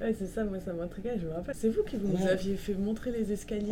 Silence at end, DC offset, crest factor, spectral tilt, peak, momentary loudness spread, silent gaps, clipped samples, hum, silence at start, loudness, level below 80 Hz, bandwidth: 0 s; under 0.1%; 16 dB; -7 dB/octave; -16 dBFS; 7 LU; none; under 0.1%; none; 0 s; -33 LUFS; -46 dBFS; 16.5 kHz